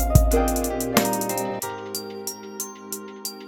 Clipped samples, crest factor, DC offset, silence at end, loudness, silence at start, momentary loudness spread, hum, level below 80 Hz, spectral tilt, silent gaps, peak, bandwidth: under 0.1%; 24 dB; under 0.1%; 0 s; -25 LUFS; 0 s; 12 LU; none; -30 dBFS; -4.5 dB/octave; none; 0 dBFS; 19.5 kHz